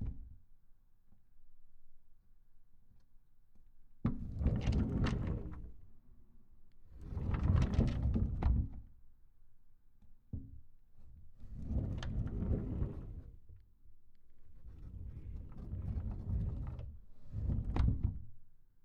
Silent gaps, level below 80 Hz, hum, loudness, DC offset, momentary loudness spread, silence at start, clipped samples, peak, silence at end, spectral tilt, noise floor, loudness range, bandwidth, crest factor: none; -44 dBFS; none; -39 LUFS; under 0.1%; 21 LU; 0 s; under 0.1%; -18 dBFS; 0.05 s; -8.5 dB/octave; -60 dBFS; 11 LU; 7.2 kHz; 22 dB